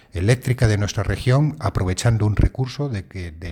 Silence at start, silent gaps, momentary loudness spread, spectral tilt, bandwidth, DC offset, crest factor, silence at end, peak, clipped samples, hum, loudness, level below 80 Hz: 0.15 s; none; 8 LU; -6 dB/octave; 14 kHz; under 0.1%; 16 dB; 0 s; -4 dBFS; under 0.1%; none; -21 LUFS; -30 dBFS